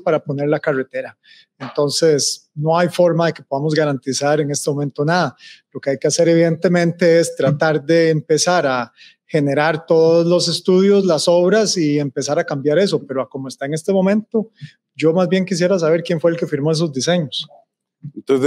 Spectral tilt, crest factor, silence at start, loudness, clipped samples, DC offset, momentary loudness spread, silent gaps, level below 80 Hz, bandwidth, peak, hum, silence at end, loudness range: -5 dB/octave; 14 dB; 0.05 s; -17 LUFS; under 0.1%; under 0.1%; 11 LU; none; -74 dBFS; 14.5 kHz; -2 dBFS; none; 0 s; 4 LU